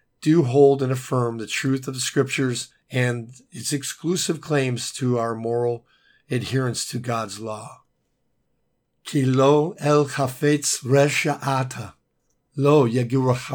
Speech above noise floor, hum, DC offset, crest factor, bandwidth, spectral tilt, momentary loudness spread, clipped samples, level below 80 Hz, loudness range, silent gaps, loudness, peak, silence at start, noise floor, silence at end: 49 dB; none; under 0.1%; 18 dB; 19 kHz; -5 dB/octave; 13 LU; under 0.1%; -66 dBFS; 7 LU; none; -22 LUFS; -4 dBFS; 0.2 s; -71 dBFS; 0 s